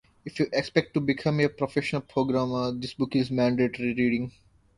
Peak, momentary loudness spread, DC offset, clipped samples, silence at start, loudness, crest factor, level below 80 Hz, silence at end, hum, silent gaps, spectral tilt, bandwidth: -6 dBFS; 6 LU; under 0.1%; under 0.1%; 0.25 s; -27 LUFS; 20 dB; -58 dBFS; 0.45 s; none; none; -7 dB/octave; 11 kHz